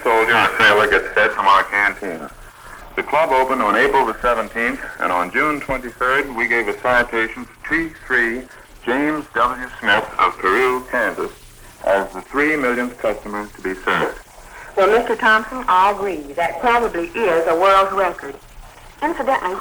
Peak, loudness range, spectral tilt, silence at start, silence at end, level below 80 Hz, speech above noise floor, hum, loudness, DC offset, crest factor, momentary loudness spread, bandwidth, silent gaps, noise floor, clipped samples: 0 dBFS; 4 LU; -4 dB/octave; 0 s; 0 s; -44 dBFS; 22 dB; none; -17 LUFS; under 0.1%; 18 dB; 12 LU; over 20 kHz; none; -40 dBFS; under 0.1%